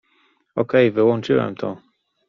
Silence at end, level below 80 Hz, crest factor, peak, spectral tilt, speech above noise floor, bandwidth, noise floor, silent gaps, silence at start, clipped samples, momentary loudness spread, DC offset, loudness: 0.5 s; -60 dBFS; 18 dB; -2 dBFS; -5.5 dB/octave; 44 dB; 7.2 kHz; -62 dBFS; none; 0.55 s; under 0.1%; 13 LU; under 0.1%; -20 LUFS